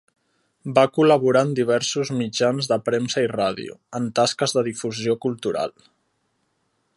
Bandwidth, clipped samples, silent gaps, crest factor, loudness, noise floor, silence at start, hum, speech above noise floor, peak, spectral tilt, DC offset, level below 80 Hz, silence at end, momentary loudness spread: 11.5 kHz; under 0.1%; none; 20 dB; -21 LUFS; -70 dBFS; 0.65 s; none; 49 dB; -2 dBFS; -4.5 dB/octave; under 0.1%; -64 dBFS; 1.25 s; 10 LU